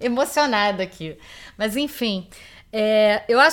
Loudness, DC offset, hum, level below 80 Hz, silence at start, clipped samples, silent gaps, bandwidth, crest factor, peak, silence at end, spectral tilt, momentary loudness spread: -21 LUFS; under 0.1%; none; -54 dBFS; 0 s; under 0.1%; none; 17.5 kHz; 18 dB; -2 dBFS; 0 s; -3.5 dB/octave; 18 LU